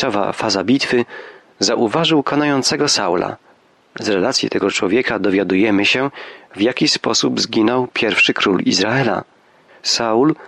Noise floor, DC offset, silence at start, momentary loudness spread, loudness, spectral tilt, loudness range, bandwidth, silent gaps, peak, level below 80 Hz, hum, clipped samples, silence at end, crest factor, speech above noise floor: -51 dBFS; under 0.1%; 0 s; 9 LU; -16 LUFS; -3.5 dB/octave; 2 LU; 12 kHz; none; -4 dBFS; -58 dBFS; none; under 0.1%; 0 s; 14 dB; 34 dB